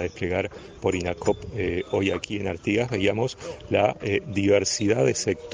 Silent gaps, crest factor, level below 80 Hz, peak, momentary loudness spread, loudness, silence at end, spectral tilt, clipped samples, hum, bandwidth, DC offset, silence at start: none; 18 dB; -52 dBFS; -6 dBFS; 7 LU; -25 LUFS; 0 s; -5 dB/octave; under 0.1%; none; 10 kHz; under 0.1%; 0 s